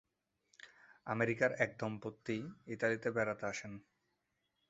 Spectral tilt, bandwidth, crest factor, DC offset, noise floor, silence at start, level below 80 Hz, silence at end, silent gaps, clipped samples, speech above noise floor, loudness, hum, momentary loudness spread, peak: -5 dB/octave; 8 kHz; 24 dB; under 0.1%; -84 dBFS; 0.65 s; -74 dBFS; 0.9 s; none; under 0.1%; 46 dB; -38 LUFS; none; 23 LU; -16 dBFS